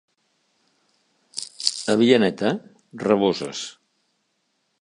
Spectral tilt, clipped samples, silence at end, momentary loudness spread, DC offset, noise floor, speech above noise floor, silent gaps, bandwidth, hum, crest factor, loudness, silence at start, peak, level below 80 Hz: -4.5 dB/octave; under 0.1%; 1.1 s; 17 LU; under 0.1%; -72 dBFS; 52 dB; none; 11 kHz; none; 24 dB; -22 LUFS; 1.35 s; 0 dBFS; -66 dBFS